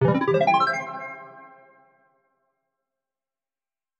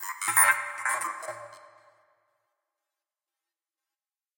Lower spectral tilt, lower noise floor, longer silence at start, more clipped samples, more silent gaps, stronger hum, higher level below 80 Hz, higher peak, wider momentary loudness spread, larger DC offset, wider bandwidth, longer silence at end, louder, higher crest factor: first, -7 dB/octave vs 1 dB/octave; about the same, under -90 dBFS vs under -90 dBFS; about the same, 0 s vs 0 s; neither; neither; neither; first, -72 dBFS vs -90 dBFS; about the same, -6 dBFS vs -6 dBFS; about the same, 21 LU vs 19 LU; neither; second, 8.4 kHz vs 17 kHz; second, 2.55 s vs 2.8 s; about the same, -22 LUFS vs -24 LUFS; second, 20 dB vs 26 dB